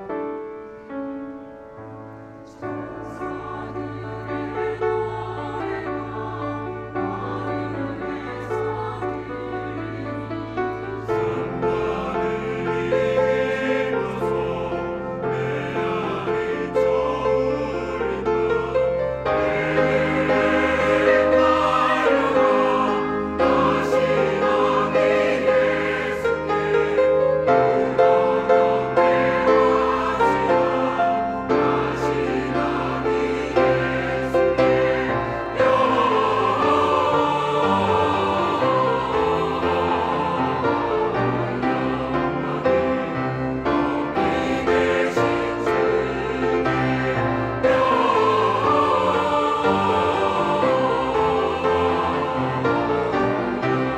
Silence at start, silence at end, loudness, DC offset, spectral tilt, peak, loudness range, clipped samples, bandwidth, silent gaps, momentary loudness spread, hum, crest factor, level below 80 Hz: 0 s; 0 s; -21 LUFS; under 0.1%; -6.5 dB/octave; -4 dBFS; 9 LU; under 0.1%; 9.4 kHz; none; 11 LU; none; 16 dB; -44 dBFS